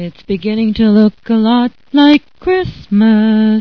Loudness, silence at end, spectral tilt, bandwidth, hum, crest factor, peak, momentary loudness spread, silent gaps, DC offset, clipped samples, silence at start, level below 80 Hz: -12 LUFS; 0 s; -8.5 dB/octave; 5.4 kHz; none; 12 dB; 0 dBFS; 7 LU; none; 0.7%; 0.3%; 0 s; -40 dBFS